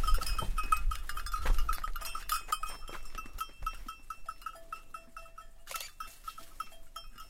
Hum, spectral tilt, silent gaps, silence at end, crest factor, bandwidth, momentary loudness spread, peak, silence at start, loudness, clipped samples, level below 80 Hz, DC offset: none; -2.5 dB/octave; none; 0 s; 20 dB; 16.5 kHz; 15 LU; -12 dBFS; 0 s; -39 LUFS; under 0.1%; -36 dBFS; under 0.1%